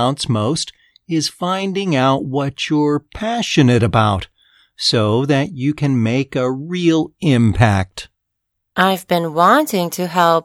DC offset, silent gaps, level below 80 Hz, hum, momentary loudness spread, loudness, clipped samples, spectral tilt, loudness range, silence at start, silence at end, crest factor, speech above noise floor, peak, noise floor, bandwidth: under 0.1%; none; -44 dBFS; none; 8 LU; -17 LUFS; under 0.1%; -5.5 dB/octave; 2 LU; 0 s; 0.05 s; 16 dB; 59 dB; 0 dBFS; -75 dBFS; 16.5 kHz